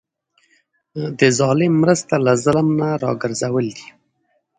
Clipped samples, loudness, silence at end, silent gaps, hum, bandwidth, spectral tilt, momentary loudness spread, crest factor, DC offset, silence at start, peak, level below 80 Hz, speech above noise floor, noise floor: under 0.1%; -18 LUFS; 0.75 s; none; none; 9.6 kHz; -5.5 dB/octave; 12 LU; 18 dB; under 0.1%; 0.95 s; 0 dBFS; -56 dBFS; 50 dB; -67 dBFS